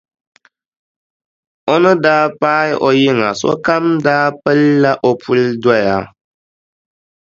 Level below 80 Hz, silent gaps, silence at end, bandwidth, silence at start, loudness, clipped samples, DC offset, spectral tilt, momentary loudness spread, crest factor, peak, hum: -54 dBFS; none; 1.25 s; 7.6 kHz; 1.65 s; -13 LUFS; under 0.1%; under 0.1%; -6 dB/octave; 5 LU; 14 dB; 0 dBFS; none